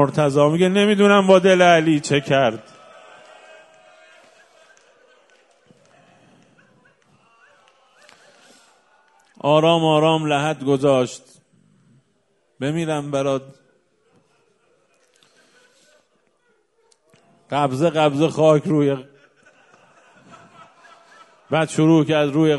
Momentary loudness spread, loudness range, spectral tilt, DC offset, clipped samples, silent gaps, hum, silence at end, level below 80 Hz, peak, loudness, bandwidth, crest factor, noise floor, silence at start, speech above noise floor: 11 LU; 11 LU; -6 dB/octave; under 0.1%; under 0.1%; none; none; 0 s; -64 dBFS; 0 dBFS; -17 LUFS; 11.5 kHz; 20 dB; -65 dBFS; 0 s; 49 dB